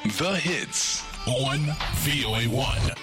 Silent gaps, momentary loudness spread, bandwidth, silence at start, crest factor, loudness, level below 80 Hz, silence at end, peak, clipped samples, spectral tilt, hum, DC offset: none; 3 LU; 16.5 kHz; 0 s; 14 dB; -25 LUFS; -38 dBFS; 0 s; -12 dBFS; under 0.1%; -3.5 dB/octave; none; under 0.1%